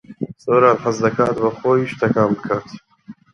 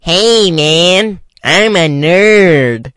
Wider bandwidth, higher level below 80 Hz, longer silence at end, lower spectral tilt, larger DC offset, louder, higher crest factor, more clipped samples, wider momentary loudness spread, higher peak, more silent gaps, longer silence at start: second, 10 kHz vs 12 kHz; second, -56 dBFS vs -42 dBFS; first, 0.2 s vs 0.05 s; first, -7 dB/octave vs -4 dB/octave; neither; second, -18 LUFS vs -8 LUFS; first, 18 dB vs 10 dB; second, under 0.1% vs 0.4%; first, 10 LU vs 5 LU; about the same, 0 dBFS vs 0 dBFS; neither; about the same, 0.1 s vs 0.05 s